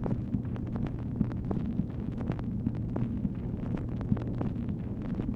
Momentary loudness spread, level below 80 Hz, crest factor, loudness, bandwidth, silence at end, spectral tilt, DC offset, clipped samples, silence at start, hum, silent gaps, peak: 3 LU; -42 dBFS; 20 dB; -34 LUFS; 4.8 kHz; 0 s; -10.5 dB/octave; under 0.1%; under 0.1%; 0 s; none; none; -12 dBFS